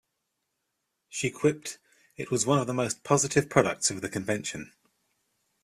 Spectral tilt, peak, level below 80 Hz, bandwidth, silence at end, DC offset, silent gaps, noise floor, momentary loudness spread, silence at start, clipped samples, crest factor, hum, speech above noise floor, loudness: -4 dB/octave; -4 dBFS; -62 dBFS; 15 kHz; 0.95 s; under 0.1%; none; -81 dBFS; 17 LU; 1.1 s; under 0.1%; 26 dB; none; 53 dB; -27 LUFS